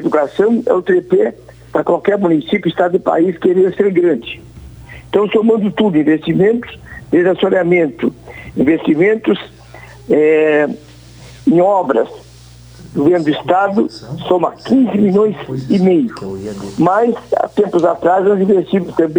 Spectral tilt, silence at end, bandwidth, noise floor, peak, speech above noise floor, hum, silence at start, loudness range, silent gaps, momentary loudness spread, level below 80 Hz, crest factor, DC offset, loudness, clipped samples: -7.5 dB/octave; 0 s; over 20 kHz; -38 dBFS; 0 dBFS; 26 dB; none; 0 s; 1 LU; none; 9 LU; -46 dBFS; 14 dB; under 0.1%; -14 LUFS; under 0.1%